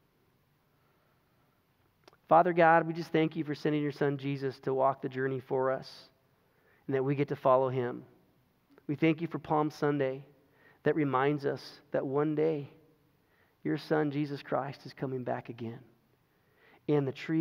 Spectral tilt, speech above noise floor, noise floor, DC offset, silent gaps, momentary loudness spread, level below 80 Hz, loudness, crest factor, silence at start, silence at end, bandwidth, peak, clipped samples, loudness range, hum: -8 dB/octave; 40 dB; -71 dBFS; under 0.1%; none; 15 LU; -78 dBFS; -31 LUFS; 22 dB; 2.3 s; 0 s; 15 kHz; -10 dBFS; under 0.1%; 7 LU; none